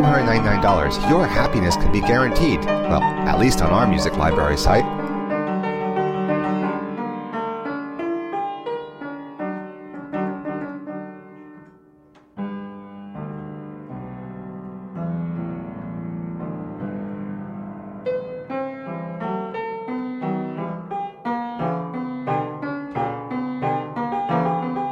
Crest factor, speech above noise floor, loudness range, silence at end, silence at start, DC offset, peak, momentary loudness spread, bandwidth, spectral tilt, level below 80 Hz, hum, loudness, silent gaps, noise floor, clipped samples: 20 dB; 35 dB; 14 LU; 0 s; 0 s; under 0.1%; -4 dBFS; 17 LU; 16 kHz; -6 dB/octave; -34 dBFS; none; -23 LUFS; none; -52 dBFS; under 0.1%